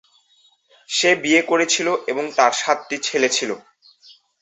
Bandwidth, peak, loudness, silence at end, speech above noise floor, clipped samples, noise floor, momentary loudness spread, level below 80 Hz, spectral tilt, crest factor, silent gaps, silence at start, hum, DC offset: 8.4 kHz; -2 dBFS; -18 LUFS; 0.8 s; 40 dB; under 0.1%; -59 dBFS; 7 LU; -70 dBFS; -1.5 dB/octave; 20 dB; none; 0.9 s; none; under 0.1%